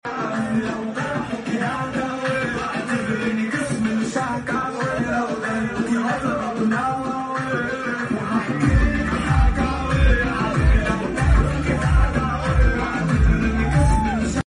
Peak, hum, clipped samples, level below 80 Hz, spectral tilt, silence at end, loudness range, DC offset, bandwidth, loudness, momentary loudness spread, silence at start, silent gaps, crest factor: -6 dBFS; none; under 0.1%; -24 dBFS; -6.5 dB/octave; 0.05 s; 4 LU; under 0.1%; 11 kHz; -21 LUFS; 6 LU; 0.05 s; none; 14 dB